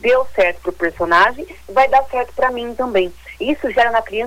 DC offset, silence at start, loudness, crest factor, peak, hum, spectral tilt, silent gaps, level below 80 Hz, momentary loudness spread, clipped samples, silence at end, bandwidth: under 0.1%; 0.05 s; -17 LUFS; 16 dB; -2 dBFS; none; -4.5 dB/octave; none; -42 dBFS; 9 LU; under 0.1%; 0 s; 18 kHz